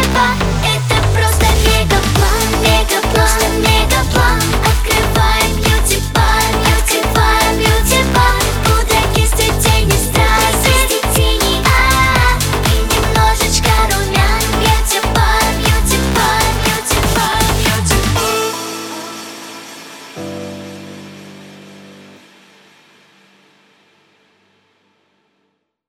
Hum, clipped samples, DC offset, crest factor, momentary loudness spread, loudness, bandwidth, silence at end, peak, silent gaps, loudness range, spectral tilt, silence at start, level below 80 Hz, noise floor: none; under 0.1%; under 0.1%; 14 dB; 14 LU; -12 LUFS; 18 kHz; 4 s; 0 dBFS; none; 11 LU; -3.5 dB/octave; 0 s; -18 dBFS; -66 dBFS